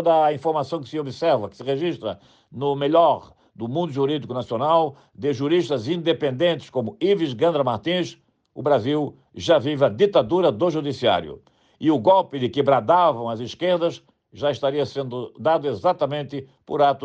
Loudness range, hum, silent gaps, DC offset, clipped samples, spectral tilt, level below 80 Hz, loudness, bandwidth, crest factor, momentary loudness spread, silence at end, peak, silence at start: 3 LU; none; none; under 0.1%; under 0.1%; -6.5 dB/octave; -64 dBFS; -22 LUFS; 8.6 kHz; 16 dB; 11 LU; 0 s; -6 dBFS; 0 s